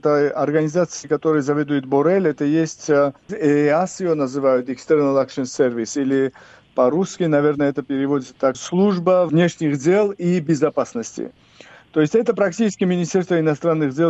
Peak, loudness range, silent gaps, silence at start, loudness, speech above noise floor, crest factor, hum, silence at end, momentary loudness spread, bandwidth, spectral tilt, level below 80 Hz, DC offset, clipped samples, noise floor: -4 dBFS; 2 LU; none; 0.05 s; -19 LUFS; 28 dB; 14 dB; none; 0 s; 5 LU; 8.2 kHz; -6.5 dB/octave; -62 dBFS; under 0.1%; under 0.1%; -46 dBFS